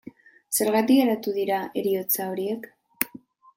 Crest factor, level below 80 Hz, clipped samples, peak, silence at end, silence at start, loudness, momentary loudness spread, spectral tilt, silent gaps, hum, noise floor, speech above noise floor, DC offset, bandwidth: 24 dB; -72 dBFS; under 0.1%; -2 dBFS; 0.4 s; 0.05 s; -24 LUFS; 10 LU; -4 dB/octave; none; none; -48 dBFS; 25 dB; under 0.1%; 17 kHz